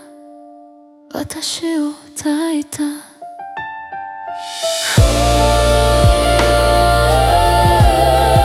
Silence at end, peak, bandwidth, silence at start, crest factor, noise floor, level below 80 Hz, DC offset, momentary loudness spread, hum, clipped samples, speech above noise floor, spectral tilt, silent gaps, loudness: 0 s; 0 dBFS; 16.5 kHz; 0.25 s; 14 dB; -43 dBFS; -22 dBFS; under 0.1%; 16 LU; none; under 0.1%; 23 dB; -5 dB/octave; none; -14 LUFS